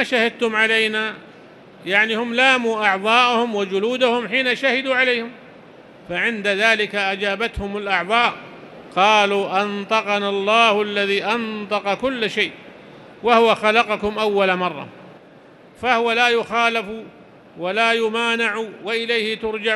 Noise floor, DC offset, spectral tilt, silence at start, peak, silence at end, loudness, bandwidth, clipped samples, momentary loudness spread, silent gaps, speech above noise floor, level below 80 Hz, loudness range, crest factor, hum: -46 dBFS; under 0.1%; -3.5 dB/octave; 0 s; 0 dBFS; 0 s; -18 LUFS; 12 kHz; under 0.1%; 10 LU; none; 27 dB; -52 dBFS; 3 LU; 20 dB; none